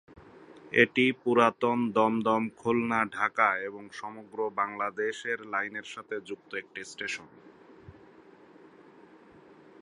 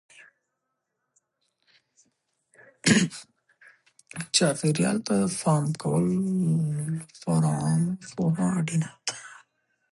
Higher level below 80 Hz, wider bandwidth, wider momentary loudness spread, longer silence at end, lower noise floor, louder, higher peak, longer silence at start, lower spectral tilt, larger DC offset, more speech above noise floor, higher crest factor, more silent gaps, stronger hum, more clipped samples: second, -70 dBFS vs -64 dBFS; about the same, 11 kHz vs 11.5 kHz; first, 15 LU vs 11 LU; first, 1.9 s vs 0.6 s; second, -55 dBFS vs -81 dBFS; second, -28 LUFS vs -25 LUFS; about the same, -6 dBFS vs -8 dBFS; second, 0.1 s vs 2.85 s; about the same, -5 dB/octave vs -5 dB/octave; neither; second, 26 dB vs 56 dB; about the same, 24 dB vs 20 dB; neither; neither; neither